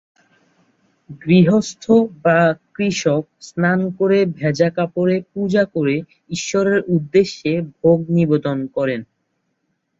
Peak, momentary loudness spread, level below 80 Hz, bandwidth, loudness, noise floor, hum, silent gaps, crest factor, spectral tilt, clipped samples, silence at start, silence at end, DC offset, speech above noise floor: -2 dBFS; 8 LU; -56 dBFS; 7.8 kHz; -18 LUFS; -70 dBFS; none; none; 16 dB; -6.5 dB/octave; under 0.1%; 1.1 s; 0.95 s; under 0.1%; 53 dB